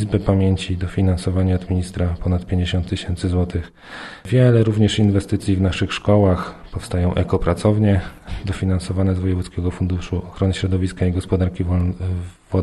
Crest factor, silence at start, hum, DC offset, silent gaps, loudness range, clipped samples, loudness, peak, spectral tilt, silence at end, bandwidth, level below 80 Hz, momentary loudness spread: 16 dB; 0 s; none; under 0.1%; none; 4 LU; under 0.1%; -20 LUFS; -2 dBFS; -7.5 dB/octave; 0 s; 11.5 kHz; -34 dBFS; 10 LU